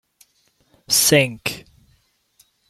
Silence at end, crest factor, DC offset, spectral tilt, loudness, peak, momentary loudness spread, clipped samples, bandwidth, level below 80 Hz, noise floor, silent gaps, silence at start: 1.1 s; 22 dB; under 0.1%; -2.5 dB/octave; -17 LUFS; -2 dBFS; 15 LU; under 0.1%; 16.5 kHz; -56 dBFS; -63 dBFS; none; 0.9 s